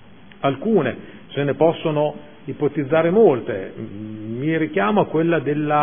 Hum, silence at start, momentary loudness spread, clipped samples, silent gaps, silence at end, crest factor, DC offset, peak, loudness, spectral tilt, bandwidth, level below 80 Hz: none; 0.4 s; 16 LU; under 0.1%; none; 0 s; 18 dB; 0.5%; -2 dBFS; -20 LUFS; -11.5 dB/octave; 3.6 kHz; -60 dBFS